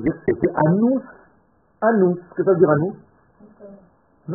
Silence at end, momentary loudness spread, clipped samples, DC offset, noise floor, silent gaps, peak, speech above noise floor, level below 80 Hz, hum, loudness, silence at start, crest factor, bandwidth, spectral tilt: 0 s; 8 LU; under 0.1%; under 0.1%; -59 dBFS; none; -2 dBFS; 41 dB; -54 dBFS; none; -19 LUFS; 0 s; 18 dB; 2.4 kHz; -5.5 dB/octave